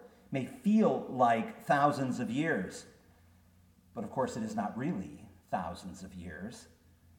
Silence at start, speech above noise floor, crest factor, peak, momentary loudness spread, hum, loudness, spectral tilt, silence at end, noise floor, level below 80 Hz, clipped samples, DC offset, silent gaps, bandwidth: 0 s; 31 dB; 20 dB; -14 dBFS; 18 LU; none; -33 LUFS; -6.5 dB/octave; 0.55 s; -63 dBFS; -66 dBFS; under 0.1%; under 0.1%; none; 16.5 kHz